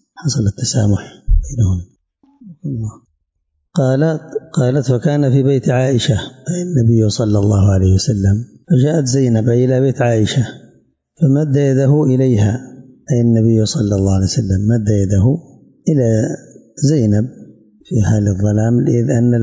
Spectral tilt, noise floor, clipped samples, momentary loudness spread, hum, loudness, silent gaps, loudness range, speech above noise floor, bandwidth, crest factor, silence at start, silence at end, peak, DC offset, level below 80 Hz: -7 dB/octave; -69 dBFS; under 0.1%; 9 LU; none; -15 LUFS; none; 6 LU; 55 dB; 8 kHz; 10 dB; 0.2 s; 0 s; -4 dBFS; under 0.1%; -28 dBFS